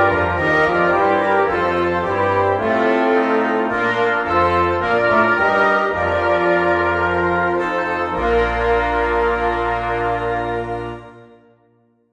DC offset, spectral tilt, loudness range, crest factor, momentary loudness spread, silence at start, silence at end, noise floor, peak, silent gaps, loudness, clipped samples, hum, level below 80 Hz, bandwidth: under 0.1%; -7 dB/octave; 3 LU; 14 dB; 5 LU; 0 s; 0.9 s; -58 dBFS; -2 dBFS; none; -17 LUFS; under 0.1%; none; -38 dBFS; 9.8 kHz